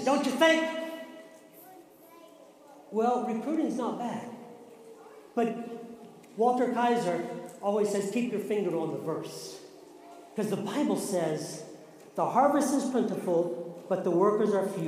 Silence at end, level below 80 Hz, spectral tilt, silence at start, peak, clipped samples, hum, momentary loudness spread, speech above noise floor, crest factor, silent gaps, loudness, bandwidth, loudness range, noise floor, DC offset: 0 s; -80 dBFS; -5 dB/octave; 0 s; -8 dBFS; under 0.1%; none; 22 LU; 25 dB; 22 dB; none; -29 LUFS; 15.5 kHz; 5 LU; -53 dBFS; under 0.1%